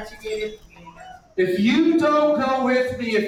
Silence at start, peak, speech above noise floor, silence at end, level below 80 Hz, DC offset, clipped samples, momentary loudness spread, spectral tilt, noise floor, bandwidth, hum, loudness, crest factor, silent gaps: 0 s; -8 dBFS; 23 dB; 0 s; -52 dBFS; under 0.1%; under 0.1%; 13 LU; -5.5 dB/octave; -43 dBFS; 15 kHz; none; -20 LUFS; 12 dB; none